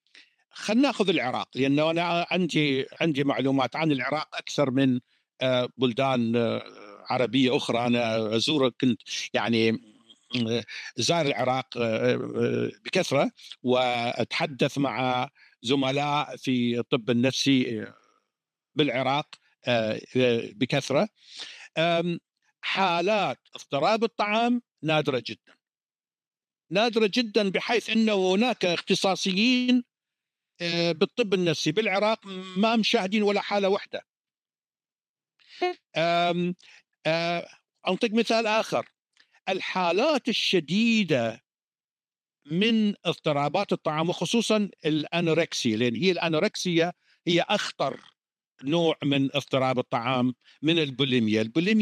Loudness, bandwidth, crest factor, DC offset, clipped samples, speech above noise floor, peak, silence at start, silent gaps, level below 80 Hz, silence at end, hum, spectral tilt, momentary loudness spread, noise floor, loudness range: -26 LUFS; 13.5 kHz; 18 dB; under 0.1%; under 0.1%; over 65 dB; -8 dBFS; 0.55 s; 34.10-34.14 s, 34.20-34.24 s, 35.09-35.15 s, 41.64-41.72 s, 41.84-41.96 s; -76 dBFS; 0 s; none; -5 dB/octave; 8 LU; under -90 dBFS; 3 LU